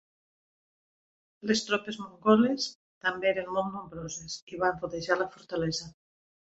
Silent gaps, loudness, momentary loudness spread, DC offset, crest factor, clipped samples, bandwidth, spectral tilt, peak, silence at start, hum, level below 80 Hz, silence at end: 2.75-3.01 s, 4.42-4.47 s; -30 LUFS; 15 LU; under 0.1%; 22 dB; under 0.1%; 8 kHz; -4 dB/octave; -8 dBFS; 1.45 s; none; -64 dBFS; 0.6 s